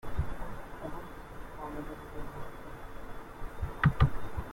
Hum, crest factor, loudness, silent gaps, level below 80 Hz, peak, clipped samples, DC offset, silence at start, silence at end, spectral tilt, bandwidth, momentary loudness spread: none; 22 dB; -36 LUFS; none; -42 dBFS; -12 dBFS; under 0.1%; under 0.1%; 0.05 s; 0 s; -7.5 dB/octave; 16.5 kHz; 17 LU